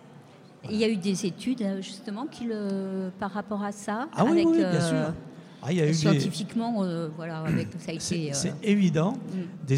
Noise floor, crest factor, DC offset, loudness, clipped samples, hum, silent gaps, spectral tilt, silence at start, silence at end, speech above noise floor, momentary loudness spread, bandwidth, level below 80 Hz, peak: -50 dBFS; 18 dB; under 0.1%; -28 LUFS; under 0.1%; none; none; -6 dB/octave; 0.05 s; 0 s; 24 dB; 12 LU; 13.5 kHz; -62 dBFS; -10 dBFS